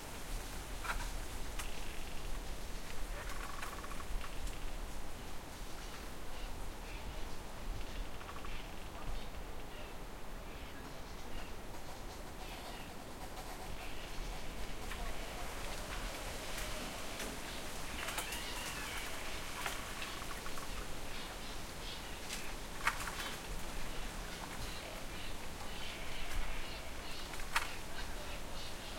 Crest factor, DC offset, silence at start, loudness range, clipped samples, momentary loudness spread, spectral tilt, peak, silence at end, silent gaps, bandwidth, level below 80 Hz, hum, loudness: 24 dB; under 0.1%; 0 s; 6 LU; under 0.1%; 8 LU; -3 dB/octave; -18 dBFS; 0 s; none; 16.5 kHz; -46 dBFS; none; -45 LUFS